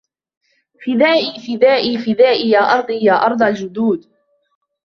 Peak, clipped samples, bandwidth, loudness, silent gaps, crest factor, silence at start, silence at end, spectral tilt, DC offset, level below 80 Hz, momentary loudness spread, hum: -2 dBFS; under 0.1%; 6.6 kHz; -15 LUFS; none; 14 dB; 0.8 s; 0.85 s; -5.5 dB/octave; under 0.1%; -62 dBFS; 7 LU; none